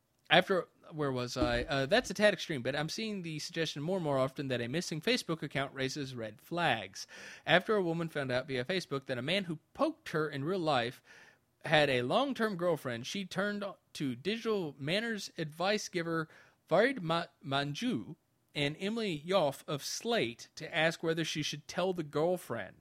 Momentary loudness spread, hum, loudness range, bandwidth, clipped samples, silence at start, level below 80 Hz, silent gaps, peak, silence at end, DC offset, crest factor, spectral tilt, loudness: 10 LU; none; 3 LU; 16 kHz; under 0.1%; 0.3 s; -60 dBFS; none; -8 dBFS; 0.1 s; under 0.1%; 26 dB; -4.5 dB/octave; -33 LUFS